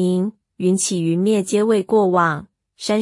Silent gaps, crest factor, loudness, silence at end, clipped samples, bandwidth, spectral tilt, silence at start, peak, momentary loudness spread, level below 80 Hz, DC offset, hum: none; 14 dB; -18 LUFS; 0 s; under 0.1%; 12 kHz; -5 dB/octave; 0 s; -4 dBFS; 9 LU; -64 dBFS; under 0.1%; none